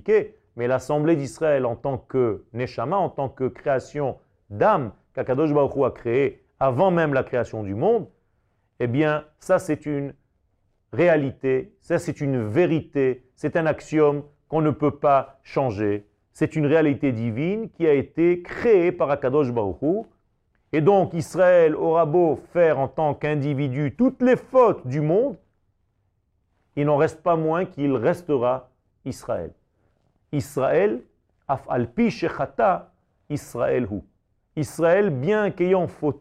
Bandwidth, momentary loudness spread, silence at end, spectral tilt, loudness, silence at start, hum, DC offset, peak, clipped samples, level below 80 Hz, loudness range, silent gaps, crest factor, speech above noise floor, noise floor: 13.5 kHz; 11 LU; 0.05 s; -7.5 dB/octave; -23 LUFS; 0.05 s; none; under 0.1%; -6 dBFS; under 0.1%; -56 dBFS; 5 LU; none; 16 dB; 48 dB; -69 dBFS